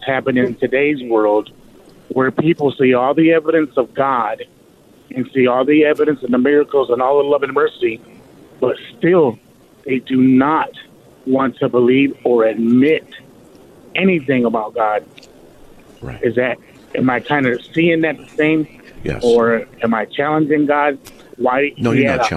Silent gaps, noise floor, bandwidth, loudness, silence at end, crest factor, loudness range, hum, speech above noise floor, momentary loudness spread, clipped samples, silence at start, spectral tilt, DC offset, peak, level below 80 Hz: none; -47 dBFS; 10.5 kHz; -16 LUFS; 0 s; 12 dB; 4 LU; none; 32 dB; 10 LU; under 0.1%; 0 s; -7 dB/octave; under 0.1%; -4 dBFS; -50 dBFS